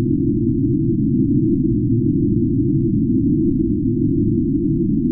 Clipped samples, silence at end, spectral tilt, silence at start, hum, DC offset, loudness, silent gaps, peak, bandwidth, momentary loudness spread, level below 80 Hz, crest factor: under 0.1%; 0 s; -18.5 dB/octave; 0 s; none; under 0.1%; -18 LUFS; none; -6 dBFS; 0.4 kHz; 2 LU; -32 dBFS; 12 dB